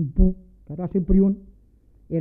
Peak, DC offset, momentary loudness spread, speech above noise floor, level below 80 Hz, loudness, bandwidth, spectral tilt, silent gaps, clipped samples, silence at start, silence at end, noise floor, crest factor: -4 dBFS; under 0.1%; 17 LU; 34 dB; -28 dBFS; -23 LUFS; 2.3 kHz; -14.5 dB/octave; none; under 0.1%; 0 s; 0 s; -54 dBFS; 18 dB